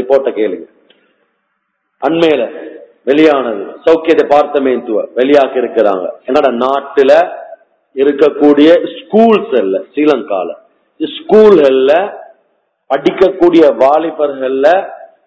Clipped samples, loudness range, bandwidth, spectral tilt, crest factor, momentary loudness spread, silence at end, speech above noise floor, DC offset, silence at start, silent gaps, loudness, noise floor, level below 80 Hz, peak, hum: 2%; 3 LU; 8 kHz; -6.5 dB/octave; 10 dB; 12 LU; 0.2 s; 56 dB; under 0.1%; 0 s; none; -10 LUFS; -66 dBFS; -54 dBFS; 0 dBFS; none